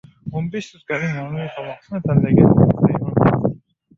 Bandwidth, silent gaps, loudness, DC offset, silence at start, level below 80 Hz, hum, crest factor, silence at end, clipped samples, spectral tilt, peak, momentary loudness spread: 7.2 kHz; none; -18 LUFS; under 0.1%; 0.25 s; -42 dBFS; none; 16 dB; 0.4 s; under 0.1%; -9.5 dB/octave; -2 dBFS; 16 LU